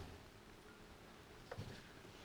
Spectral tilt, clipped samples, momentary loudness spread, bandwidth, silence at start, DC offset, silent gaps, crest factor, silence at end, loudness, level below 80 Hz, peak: -5 dB/octave; under 0.1%; 8 LU; over 20 kHz; 0 s; under 0.1%; none; 20 dB; 0 s; -57 LUFS; -66 dBFS; -36 dBFS